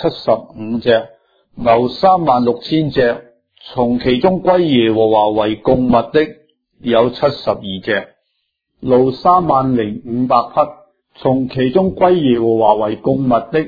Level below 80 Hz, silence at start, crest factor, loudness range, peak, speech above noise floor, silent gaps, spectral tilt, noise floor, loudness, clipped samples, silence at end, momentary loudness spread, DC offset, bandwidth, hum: -44 dBFS; 0 s; 14 dB; 2 LU; 0 dBFS; 56 dB; none; -9 dB/octave; -70 dBFS; -14 LUFS; under 0.1%; 0 s; 8 LU; under 0.1%; 5 kHz; none